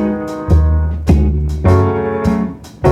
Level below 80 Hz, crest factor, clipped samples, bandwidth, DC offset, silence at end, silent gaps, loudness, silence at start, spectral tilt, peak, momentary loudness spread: -18 dBFS; 12 dB; under 0.1%; 8 kHz; under 0.1%; 0 s; none; -15 LUFS; 0 s; -9 dB/octave; -2 dBFS; 6 LU